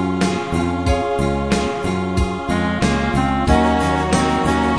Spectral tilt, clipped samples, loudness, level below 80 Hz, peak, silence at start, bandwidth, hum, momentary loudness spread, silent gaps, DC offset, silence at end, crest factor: -6 dB/octave; under 0.1%; -18 LUFS; -28 dBFS; -2 dBFS; 0 s; 11 kHz; none; 5 LU; none; 0.6%; 0 s; 16 dB